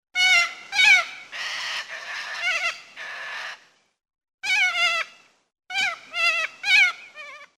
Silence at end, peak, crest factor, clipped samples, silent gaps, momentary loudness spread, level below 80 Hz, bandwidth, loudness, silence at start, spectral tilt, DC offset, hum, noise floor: 0.15 s; -6 dBFS; 18 dB; under 0.1%; 4.34-4.38 s; 18 LU; -70 dBFS; 16 kHz; -20 LUFS; 0.15 s; 2.5 dB/octave; under 0.1%; none; -48 dBFS